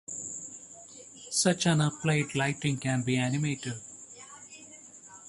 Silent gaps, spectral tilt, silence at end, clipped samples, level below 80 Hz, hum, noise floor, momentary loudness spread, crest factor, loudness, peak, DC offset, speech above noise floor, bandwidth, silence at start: none; -4.5 dB/octave; 0 s; under 0.1%; -64 dBFS; none; -50 dBFS; 20 LU; 20 dB; -29 LUFS; -10 dBFS; under 0.1%; 22 dB; 11.5 kHz; 0.1 s